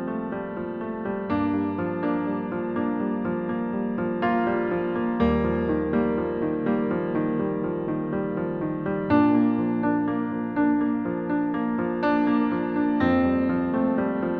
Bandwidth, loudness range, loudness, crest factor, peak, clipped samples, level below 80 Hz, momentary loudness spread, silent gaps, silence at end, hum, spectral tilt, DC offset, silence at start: 4.9 kHz; 3 LU; -25 LUFS; 16 dB; -8 dBFS; under 0.1%; -48 dBFS; 6 LU; none; 0 s; none; -10.5 dB/octave; under 0.1%; 0 s